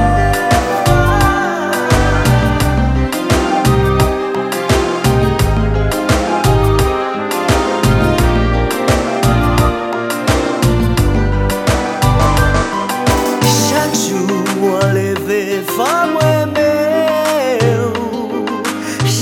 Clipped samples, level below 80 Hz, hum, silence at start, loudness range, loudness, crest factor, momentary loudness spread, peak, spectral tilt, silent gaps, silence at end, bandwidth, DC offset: under 0.1%; -22 dBFS; none; 0 s; 1 LU; -14 LUFS; 12 dB; 5 LU; 0 dBFS; -5.5 dB/octave; none; 0 s; 18.5 kHz; under 0.1%